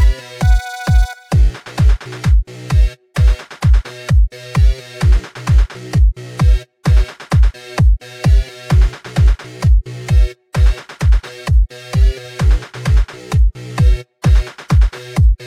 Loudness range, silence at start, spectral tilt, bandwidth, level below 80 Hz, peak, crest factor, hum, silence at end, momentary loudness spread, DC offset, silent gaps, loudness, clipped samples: 1 LU; 0 s; -6.5 dB/octave; 10.5 kHz; -14 dBFS; -2 dBFS; 10 dB; none; 0 s; 3 LU; under 0.1%; none; -16 LUFS; under 0.1%